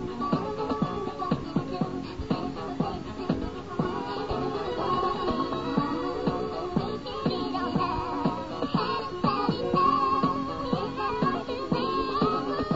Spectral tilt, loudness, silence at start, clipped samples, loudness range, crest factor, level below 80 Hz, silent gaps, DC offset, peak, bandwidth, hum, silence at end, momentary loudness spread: -7.5 dB/octave; -29 LUFS; 0 s; under 0.1%; 5 LU; 18 dB; -48 dBFS; none; 0.3%; -10 dBFS; 8 kHz; none; 0 s; 5 LU